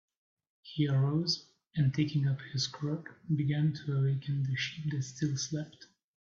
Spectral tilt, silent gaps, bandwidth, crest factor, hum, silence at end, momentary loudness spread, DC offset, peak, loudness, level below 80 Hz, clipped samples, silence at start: -5.5 dB/octave; none; 7.4 kHz; 16 dB; none; 0.5 s; 8 LU; under 0.1%; -18 dBFS; -33 LUFS; -68 dBFS; under 0.1%; 0.65 s